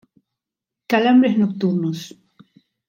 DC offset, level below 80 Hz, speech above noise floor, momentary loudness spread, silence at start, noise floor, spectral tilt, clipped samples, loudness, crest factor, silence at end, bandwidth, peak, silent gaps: under 0.1%; -72 dBFS; 69 dB; 15 LU; 0.9 s; -86 dBFS; -7 dB/octave; under 0.1%; -18 LUFS; 18 dB; 0.8 s; 16.5 kHz; -2 dBFS; none